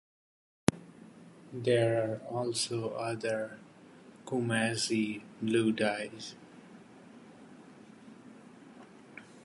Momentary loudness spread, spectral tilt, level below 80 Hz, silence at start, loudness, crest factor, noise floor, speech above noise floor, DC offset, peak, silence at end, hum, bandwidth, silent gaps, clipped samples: 24 LU; -4.5 dB/octave; -68 dBFS; 0.7 s; -32 LUFS; 30 dB; -55 dBFS; 23 dB; under 0.1%; -4 dBFS; 0 s; none; 11.5 kHz; none; under 0.1%